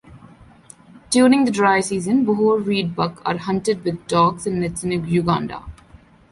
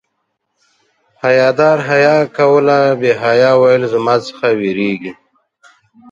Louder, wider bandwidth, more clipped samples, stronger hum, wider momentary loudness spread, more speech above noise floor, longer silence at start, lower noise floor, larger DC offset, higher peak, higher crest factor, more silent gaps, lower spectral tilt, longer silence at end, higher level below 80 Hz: second, -19 LUFS vs -12 LUFS; first, 11.5 kHz vs 7.8 kHz; neither; neither; about the same, 9 LU vs 8 LU; second, 30 dB vs 58 dB; second, 0.05 s vs 1.25 s; second, -48 dBFS vs -69 dBFS; neither; second, -4 dBFS vs 0 dBFS; about the same, 16 dB vs 14 dB; neither; about the same, -5.5 dB/octave vs -6 dB/octave; second, 0.6 s vs 1 s; first, -48 dBFS vs -60 dBFS